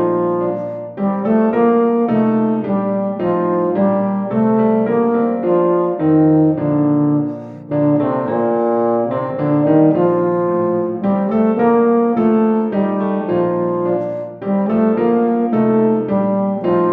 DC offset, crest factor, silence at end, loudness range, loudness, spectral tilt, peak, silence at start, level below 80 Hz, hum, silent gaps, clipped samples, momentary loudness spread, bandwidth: under 0.1%; 14 dB; 0 s; 2 LU; -16 LUFS; -11.5 dB/octave; -2 dBFS; 0 s; -56 dBFS; none; none; under 0.1%; 6 LU; 4 kHz